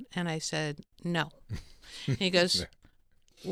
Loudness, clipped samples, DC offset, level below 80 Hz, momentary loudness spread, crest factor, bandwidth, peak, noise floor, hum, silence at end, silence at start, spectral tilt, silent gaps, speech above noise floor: -31 LUFS; under 0.1%; under 0.1%; -56 dBFS; 18 LU; 20 dB; 15.5 kHz; -12 dBFS; -63 dBFS; none; 0 s; 0 s; -4 dB/octave; none; 32 dB